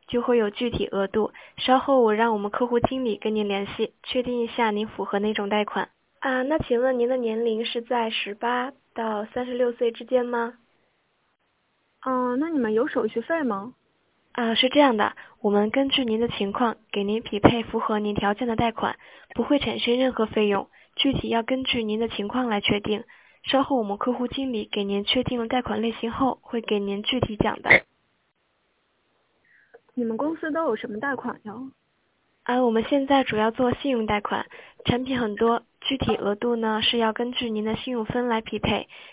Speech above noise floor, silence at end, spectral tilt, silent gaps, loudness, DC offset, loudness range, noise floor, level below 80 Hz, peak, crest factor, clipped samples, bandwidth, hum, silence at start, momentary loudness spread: 46 dB; 0 s; -9 dB/octave; none; -24 LUFS; under 0.1%; 5 LU; -70 dBFS; -50 dBFS; 0 dBFS; 24 dB; under 0.1%; 4 kHz; none; 0.1 s; 9 LU